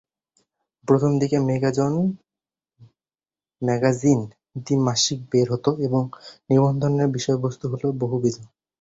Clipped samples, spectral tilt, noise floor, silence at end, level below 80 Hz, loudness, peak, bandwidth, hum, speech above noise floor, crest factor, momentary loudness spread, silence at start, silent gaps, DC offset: under 0.1%; -6 dB/octave; under -90 dBFS; 0.35 s; -58 dBFS; -22 LUFS; -4 dBFS; 8 kHz; none; over 69 dB; 18 dB; 10 LU; 0.85 s; none; under 0.1%